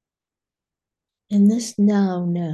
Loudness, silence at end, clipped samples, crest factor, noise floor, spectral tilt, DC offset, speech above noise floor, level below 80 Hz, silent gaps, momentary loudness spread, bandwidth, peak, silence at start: -19 LUFS; 0 s; under 0.1%; 14 dB; -90 dBFS; -7 dB/octave; under 0.1%; 72 dB; -68 dBFS; none; 6 LU; 11.5 kHz; -8 dBFS; 1.3 s